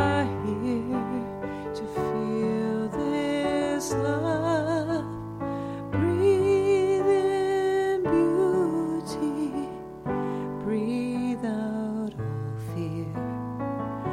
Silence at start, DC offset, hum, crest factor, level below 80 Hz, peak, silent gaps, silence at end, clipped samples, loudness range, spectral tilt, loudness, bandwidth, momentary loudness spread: 0 s; under 0.1%; 60 Hz at -55 dBFS; 16 dB; -54 dBFS; -12 dBFS; none; 0 s; under 0.1%; 7 LU; -7 dB/octave; -27 LUFS; 13.5 kHz; 10 LU